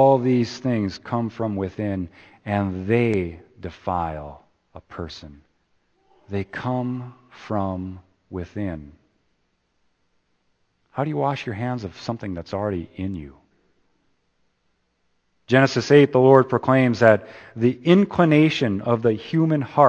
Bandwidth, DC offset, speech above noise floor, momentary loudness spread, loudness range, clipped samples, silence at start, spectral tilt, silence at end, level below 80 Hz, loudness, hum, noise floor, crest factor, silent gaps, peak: 8.6 kHz; under 0.1%; 49 dB; 20 LU; 15 LU; under 0.1%; 0 s; -7.5 dB/octave; 0 s; -54 dBFS; -21 LUFS; none; -70 dBFS; 22 dB; none; 0 dBFS